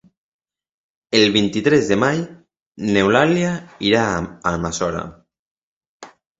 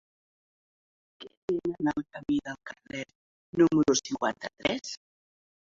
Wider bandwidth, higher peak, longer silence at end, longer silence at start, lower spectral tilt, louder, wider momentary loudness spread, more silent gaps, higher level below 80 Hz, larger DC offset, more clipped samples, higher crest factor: about the same, 8 kHz vs 7.8 kHz; first, 0 dBFS vs -10 dBFS; second, 0.3 s vs 0.85 s; about the same, 1.1 s vs 1.2 s; about the same, -5 dB/octave vs -4 dB/octave; first, -18 LUFS vs -29 LUFS; second, 10 LU vs 19 LU; first, 2.62-2.72 s, 5.39-5.81 s, 5.87-6.00 s vs 1.37-1.48 s, 3.15-3.53 s; first, -46 dBFS vs -64 dBFS; neither; neither; about the same, 20 dB vs 22 dB